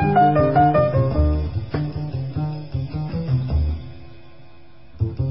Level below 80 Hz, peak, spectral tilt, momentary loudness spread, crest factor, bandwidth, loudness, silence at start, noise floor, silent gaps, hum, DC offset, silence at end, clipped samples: -28 dBFS; -4 dBFS; -13 dB/octave; 12 LU; 16 dB; 5.8 kHz; -21 LUFS; 0 s; -49 dBFS; none; none; 1%; 0 s; under 0.1%